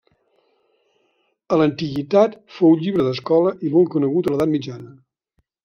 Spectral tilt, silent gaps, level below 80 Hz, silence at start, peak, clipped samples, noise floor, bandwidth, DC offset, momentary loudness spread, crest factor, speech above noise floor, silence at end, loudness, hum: -8 dB/octave; none; -58 dBFS; 1.5 s; -2 dBFS; under 0.1%; -69 dBFS; 6.8 kHz; under 0.1%; 7 LU; 18 dB; 51 dB; 0.75 s; -19 LUFS; none